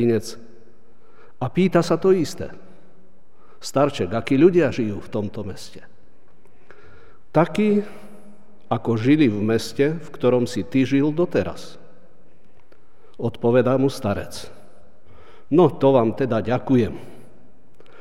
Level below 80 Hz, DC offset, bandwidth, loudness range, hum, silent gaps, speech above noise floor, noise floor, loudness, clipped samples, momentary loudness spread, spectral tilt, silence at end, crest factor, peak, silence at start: -54 dBFS; 2%; 14 kHz; 4 LU; none; none; 37 dB; -57 dBFS; -20 LUFS; under 0.1%; 18 LU; -7 dB/octave; 0.9 s; 20 dB; -4 dBFS; 0 s